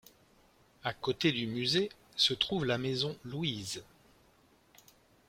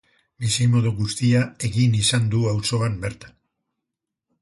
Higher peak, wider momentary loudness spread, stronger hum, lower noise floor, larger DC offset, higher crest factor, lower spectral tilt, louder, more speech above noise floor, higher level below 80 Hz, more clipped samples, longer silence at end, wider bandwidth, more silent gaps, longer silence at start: second, -12 dBFS vs -6 dBFS; first, 11 LU vs 7 LU; neither; second, -66 dBFS vs -84 dBFS; neither; first, 24 dB vs 16 dB; about the same, -4.5 dB/octave vs -5 dB/octave; second, -32 LUFS vs -21 LUFS; second, 33 dB vs 63 dB; second, -66 dBFS vs -48 dBFS; neither; first, 1.45 s vs 1.15 s; first, 16.5 kHz vs 11.5 kHz; neither; first, 0.85 s vs 0.4 s